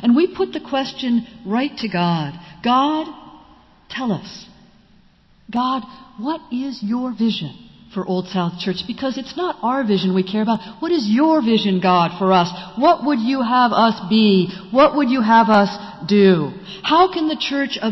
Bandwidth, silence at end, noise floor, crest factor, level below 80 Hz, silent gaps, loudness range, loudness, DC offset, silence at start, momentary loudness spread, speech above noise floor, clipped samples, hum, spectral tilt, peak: 6.2 kHz; 0 s; -52 dBFS; 14 dB; -56 dBFS; none; 10 LU; -18 LUFS; under 0.1%; 0 s; 12 LU; 35 dB; under 0.1%; none; -6.5 dB/octave; -4 dBFS